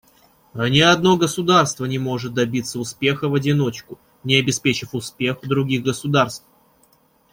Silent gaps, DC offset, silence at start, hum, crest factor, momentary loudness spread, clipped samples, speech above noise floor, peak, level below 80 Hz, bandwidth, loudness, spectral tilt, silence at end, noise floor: none; under 0.1%; 0.55 s; none; 20 dB; 10 LU; under 0.1%; 39 dB; 0 dBFS; -56 dBFS; 16.5 kHz; -19 LUFS; -4.5 dB/octave; 0.95 s; -58 dBFS